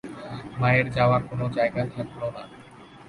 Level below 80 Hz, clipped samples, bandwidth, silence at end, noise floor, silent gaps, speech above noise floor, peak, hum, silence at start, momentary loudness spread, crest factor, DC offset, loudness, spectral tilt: -52 dBFS; under 0.1%; 11 kHz; 0 s; -47 dBFS; none; 23 dB; -8 dBFS; none; 0.05 s; 16 LU; 18 dB; under 0.1%; -25 LUFS; -8 dB/octave